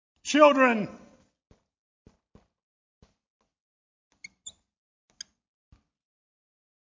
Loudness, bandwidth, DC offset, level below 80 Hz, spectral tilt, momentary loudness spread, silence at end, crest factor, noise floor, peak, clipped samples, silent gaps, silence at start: -22 LUFS; 7.6 kHz; under 0.1%; -72 dBFS; -4 dB/octave; 27 LU; 2.45 s; 26 dB; -63 dBFS; -6 dBFS; under 0.1%; 1.79-2.05 s, 2.63-3.01 s, 3.30-3.40 s, 3.60-4.11 s; 0.25 s